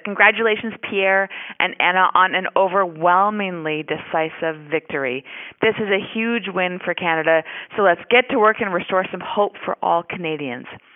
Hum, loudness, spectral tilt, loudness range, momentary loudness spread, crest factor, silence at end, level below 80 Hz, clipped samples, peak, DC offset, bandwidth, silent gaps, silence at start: none; -19 LUFS; 1 dB/octave; 4 LU; 10 LU; 20 dB; 0.2 s; -64 dBFS; under 0.1%; 0 dBFS; under 0.1%; 3.9 kHz; none; 0.05 s